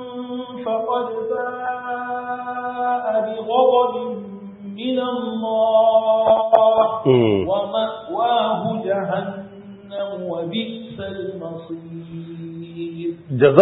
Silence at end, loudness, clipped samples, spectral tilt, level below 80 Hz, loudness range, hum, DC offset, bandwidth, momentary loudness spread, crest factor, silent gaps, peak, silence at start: 0 s; -20 LUFS; under 0.1%; -9 dB/octave; -60 dBFS; 12 LU; none; under 0.1%; 4.1 kHz; 18 LU; 20 dB; none; 0 dBFS; 0 s